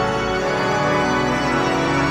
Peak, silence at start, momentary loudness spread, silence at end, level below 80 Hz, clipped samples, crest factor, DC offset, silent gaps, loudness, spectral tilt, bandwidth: -6 dBFS; 0 s; 2 LU; 0 s; -38 dBFS; under 0.1%; 12 dB; under 0.1%; none; -19 LUFS; -5 dB/octave; 14 kHz